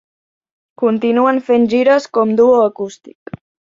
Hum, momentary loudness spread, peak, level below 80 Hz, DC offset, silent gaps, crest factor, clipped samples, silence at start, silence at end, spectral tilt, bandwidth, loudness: none; 18 LU; -2 dBFS; -60 dBFS; under 0.1%; none; 14 dB; under 0.1%; 0.8 s; 0.85 s; -6 dB/octave; 7.6 kHz; -13 LUFS